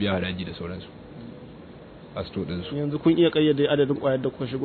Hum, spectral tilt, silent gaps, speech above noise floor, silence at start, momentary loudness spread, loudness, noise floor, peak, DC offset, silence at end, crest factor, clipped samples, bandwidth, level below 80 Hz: none; -10 dB/octave; none; 20 dB; 0 s; 23 LU; -24 LUFS; -44 dBFS; -8 dBFS; under 0.1%; 0 s; 16 dB; under 0.1%; 4.5 kHz; -54 dBFS